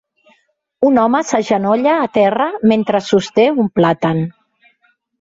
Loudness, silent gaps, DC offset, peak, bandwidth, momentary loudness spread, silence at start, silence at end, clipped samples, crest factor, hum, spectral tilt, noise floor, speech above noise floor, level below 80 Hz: -14 LUFS; none; under 0.1%; -2 dBFS; 8 kHz; 4 LU; 0.8 s; 0.9 s; under 0.1%; 14 dB; none; -6 dB/octave; -60 dBFS; 46 dB; -56 dBFS